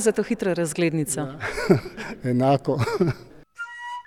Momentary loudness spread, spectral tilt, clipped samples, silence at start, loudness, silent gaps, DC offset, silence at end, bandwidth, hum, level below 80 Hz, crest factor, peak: 14 LU; -5.5 dB/octave; under 0.1%; 0 s; -24 LUFS; none; under 0.1%; 0.05 s; 17 kHz; none; -50 dBFS; 20 dB; -4 dBFS